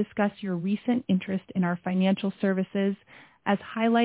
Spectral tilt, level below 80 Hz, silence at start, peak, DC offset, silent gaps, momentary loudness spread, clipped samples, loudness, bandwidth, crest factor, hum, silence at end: -11 dB/octave; -68 dBFS; 0 s; -10 dBFS; under 0.1%; none; 5 LU; under 0.1%; -28 LUFS; 4 kHz; 16 dB; none; 0 s